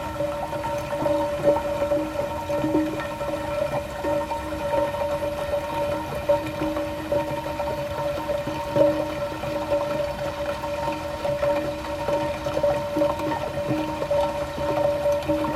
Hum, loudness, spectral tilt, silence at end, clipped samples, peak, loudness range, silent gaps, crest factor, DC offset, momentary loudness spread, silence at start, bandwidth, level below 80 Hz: none; -26 LUFS; -6 dB/octave; 0 s; under 0.1%; -6 dBFS; 2 LU; none; 18 dB; under 0.1%; 6 LU; 0 s; 15.5 kHz; -44 dBFS